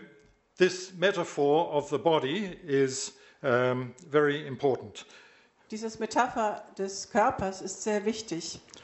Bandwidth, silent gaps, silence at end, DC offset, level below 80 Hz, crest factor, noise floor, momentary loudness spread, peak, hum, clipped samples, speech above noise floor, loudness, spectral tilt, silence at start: 8.2 kHz; none; 0.05 s; under 0.1%; -64 dBFS; 20 dB; -60 dBFS; 10 LU; -10 dBFS; none; under 0.1%; 31 dB; -29 LUFS; -4.5 dB/octave; 0 s